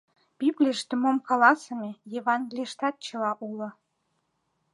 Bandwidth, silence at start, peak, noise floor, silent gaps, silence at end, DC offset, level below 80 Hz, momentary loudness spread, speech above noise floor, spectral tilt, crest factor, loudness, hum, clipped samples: 11.5 kHz; 0.4 s; -6 dBFS; -75 dBFS; none; 1.05 s; under 0.1%; -84 dBFS; 15 LU; 49 dB; -4 dB/octave; 22 dB; -26 LUFS; none; under 0.1%